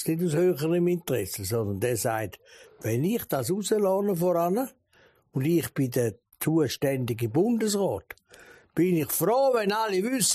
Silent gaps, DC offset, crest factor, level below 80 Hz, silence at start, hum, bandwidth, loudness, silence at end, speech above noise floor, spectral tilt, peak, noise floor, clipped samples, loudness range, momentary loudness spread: none; under 0.1%; 14 dB; -62 dBFS; 0 s; none; 15.5 kHz; -26 LUFS; 0 s; 36 dB; -5 dB/octave; -12 dBFS; -62 dBFS; under 0.1%; 2 LU; 8 LU